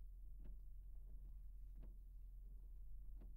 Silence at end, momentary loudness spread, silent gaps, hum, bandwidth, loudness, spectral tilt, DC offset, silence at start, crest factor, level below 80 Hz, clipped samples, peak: 0 s; 1 LU; none; none; 16 kHz; -62 LUFS; -8 dB/octave; under 0.1%; 0 s; 10 dB; -56 dBFS; under 0.1%; -44 dBFS